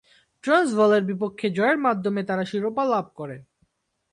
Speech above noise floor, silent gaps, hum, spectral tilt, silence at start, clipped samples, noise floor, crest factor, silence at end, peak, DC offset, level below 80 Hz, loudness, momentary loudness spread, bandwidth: 47 dB; none; none; -6 dB/octave; 0.45 s; under 0.1%; -69 dBFS; 16 dB; 0.7 s; -8 dBFS; under 0.1%; -68 dBFS; -23 LUFS; 16 LU; 11.5 kHz